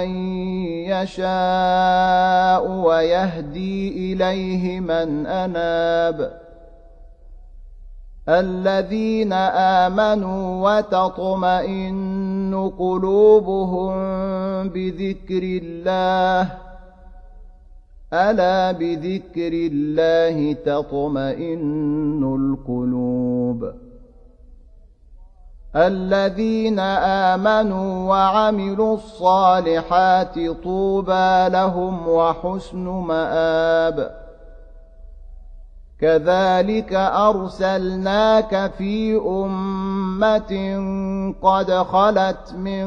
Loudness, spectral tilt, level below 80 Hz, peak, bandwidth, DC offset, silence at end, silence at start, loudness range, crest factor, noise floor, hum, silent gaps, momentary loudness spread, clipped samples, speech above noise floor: -19 LUFS; -7 dB/octave; -42 dBFS; -2 dBFS; 7.2 kHz; under 0.1%; 0 s; 0 s; 6 LU; 16 dB; -46 dBFS; none; none; 9 LU; under 0.1%; 28 dB